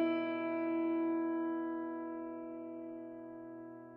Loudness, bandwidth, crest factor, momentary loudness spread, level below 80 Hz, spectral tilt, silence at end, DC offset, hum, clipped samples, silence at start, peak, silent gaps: -39 LUFS; 4.3 kHz; 14 dB; 14 LU; -86 dBFS; -4.5 dB/octave; 0 s; under 0.1%; none; under 0.1%; 0 s; -24 dBFS; none